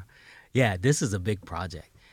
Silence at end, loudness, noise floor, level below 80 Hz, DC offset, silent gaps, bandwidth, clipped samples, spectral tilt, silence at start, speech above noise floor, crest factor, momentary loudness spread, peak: 0.3 s; -27 LUFS; -54 dBFS; -56 dBFS; under 0.1%; none; 16 kHz; under 0.1%; -5 dB/octave; 0 s; 27 dB; 20 dB; 13 LU; -8 dBFS